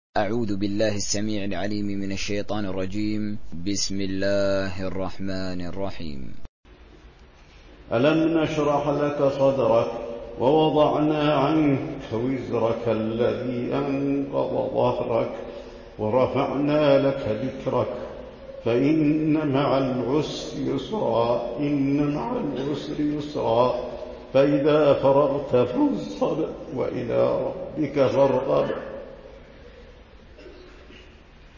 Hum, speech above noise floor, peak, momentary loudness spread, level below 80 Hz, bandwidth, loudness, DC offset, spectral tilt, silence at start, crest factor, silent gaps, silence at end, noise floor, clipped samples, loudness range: none; 26 dB; -8 dBFS; 11 LU; -48 dBFS; 7.4 kHz; -24 LUFS; under 0.1%; -6 dB/octave; 0.15 s; 16 dB; 6.49-6.63 s; 0 s; -49 dBFS; under 0.1%; 6 LU